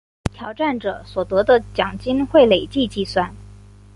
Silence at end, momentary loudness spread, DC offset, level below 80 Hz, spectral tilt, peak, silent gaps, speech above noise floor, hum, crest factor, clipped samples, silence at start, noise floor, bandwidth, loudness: 0.45 s; 14 LU; under 0.1%; -42 dBFS; -6 dB/octave; -2 dBFS; none; 24 dB; 50 Hz at -40 dBFS; 18 dB; under 0.1%; 0.25 s; -43 dBFS; 11.5 kHz; -19 LUFS